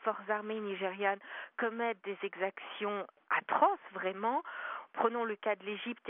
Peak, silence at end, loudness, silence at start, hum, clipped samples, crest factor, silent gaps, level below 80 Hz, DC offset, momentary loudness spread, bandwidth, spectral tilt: -14 dBFS; 0 s; -35 LUFS; 0 s; none; under 0.1%; 22 dB; none; under -90 dBFS; under 0.1%; 10 LU; 3.8 kHz; 1.5 dB/octave